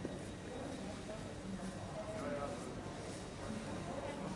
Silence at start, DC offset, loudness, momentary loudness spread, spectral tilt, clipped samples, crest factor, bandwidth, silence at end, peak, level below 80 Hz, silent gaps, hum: 0 s; under 0.1%; -45 LUFS; 4 LU; -5.5 dB/octave; under 0.1%; 16 dB; 11.5 kHz; 0 s; -28 dBFS; -58 dBFS; none; none